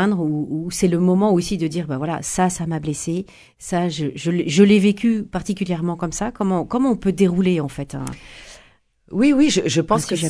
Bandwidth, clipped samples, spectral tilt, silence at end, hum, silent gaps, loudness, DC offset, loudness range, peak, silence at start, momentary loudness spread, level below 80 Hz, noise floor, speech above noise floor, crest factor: 11 kHz; under 0.1%; -5.5 dB/octave; 0 s; none; none; -20 LUFS; under 0.1%; 3 LU; 0 dBFS; 0 s; 13 LU; -46 dBFS; -54 dBFS; 35 dB; 18 dB